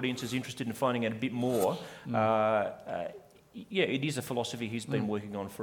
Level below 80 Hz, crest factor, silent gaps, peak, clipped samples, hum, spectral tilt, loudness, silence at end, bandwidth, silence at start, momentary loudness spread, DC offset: -70 dBFS; 18 dB; none; -14 dBFS; under 0.1%; none; -5.5 dB/octave; -32 LUFS; 0 s; 19.5 kHz; 0 s; 10 LU; under 0.1%